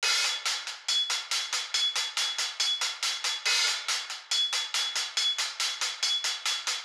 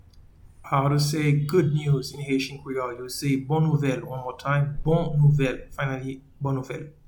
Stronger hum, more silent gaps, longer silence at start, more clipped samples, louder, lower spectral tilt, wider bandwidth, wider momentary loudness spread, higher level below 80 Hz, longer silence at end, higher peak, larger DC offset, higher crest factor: neither; neither; second, 0 s vs 0.15 s; neither; about the same, -27 LUFS vs -25 LUFS; second, 6 dB/octave vs -6.5 dB/octave; second, 16.5 kHz vs 19 kHz; second, 4 LU vs 10 LU; second, under -90 dBFS vs -44 dBFS; second, 0 s vs 0.15 s; second, -16 dBFS vs -10 dBFS; neither; about the same, 14 dB vs 16 dB